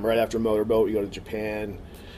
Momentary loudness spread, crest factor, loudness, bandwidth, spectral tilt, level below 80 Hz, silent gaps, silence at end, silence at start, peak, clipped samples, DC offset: 11 LU; 14 dB; -26 LUFS; 15.5 kHz; -6 dB/octave; -46 dBFS; none; 0 s; 0 s; -12 dBFS; under 0.1%; under 0.1%